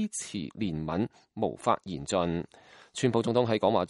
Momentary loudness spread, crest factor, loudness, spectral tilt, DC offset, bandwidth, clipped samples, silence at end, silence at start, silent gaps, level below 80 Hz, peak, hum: 10 LU; 20 dB; -30 LUFS; -5.5 dB/octave; under 0.1%; 11.5 kHz; under 0.1%; 0 s; 0 s; none; -58 dBFS; -10 dBFS; none